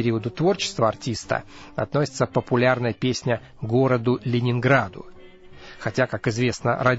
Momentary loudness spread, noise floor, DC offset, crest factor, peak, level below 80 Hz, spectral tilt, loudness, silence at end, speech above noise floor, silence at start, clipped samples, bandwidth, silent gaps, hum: 8 LU; -44 dBFS; under 0.1%; 18 dB; -4 dBFS; -52 dBFS; -6 dB/octave; -23 LUFS; 0 s; 21 dB; 0 s; under 0.1%; 8 kHz; none; none